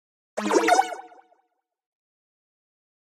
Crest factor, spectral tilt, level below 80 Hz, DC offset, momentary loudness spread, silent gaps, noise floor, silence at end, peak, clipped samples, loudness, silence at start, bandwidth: 22 dB; -3 dB/octave; -74 dBFS; under 0.1%; 18 LU; none; -73 dBFS; 2.05 s; -6 dBFS; under 0.1%; -23 LUFS; 0.35 s; 15.5 kHz